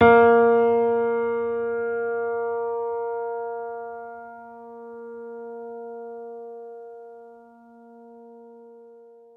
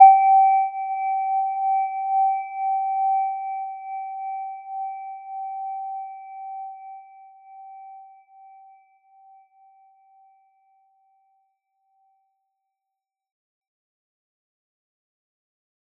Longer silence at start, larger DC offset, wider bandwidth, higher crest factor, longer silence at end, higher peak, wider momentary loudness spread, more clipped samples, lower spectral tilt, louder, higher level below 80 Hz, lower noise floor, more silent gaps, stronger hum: about the same, 0 s vs 0 s; neither; first, 3.8 kHz vs 2.5 kHz; about the same, 20 dB vs 24 dB; second, 0.55 s vs 7.95 s; about the same, -4 dBFS vs -2 dBFS; about the same, 24 LU vs 23 LU; neither; first, -9 dB/octave vs 0.5 dB/octave; about the same, -22 LUFS vs -23 LUFS; first, -64 dBFS vs under -90 dBFS; second, -49 dBFS vs -86 dBFS; neither; neither